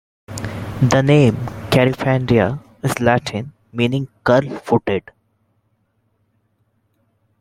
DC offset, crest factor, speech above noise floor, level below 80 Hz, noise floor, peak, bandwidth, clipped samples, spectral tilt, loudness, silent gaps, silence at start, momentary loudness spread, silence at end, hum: under 0.1%; 18 dB; 49 dB; -46 dBFS; -65 dBFS; 0 dBFS; 16 kHz; under 0.1%; -6.5 dB/octave; -18 LUFS; none; 0.3 s; 14 LU; 2.4 s; none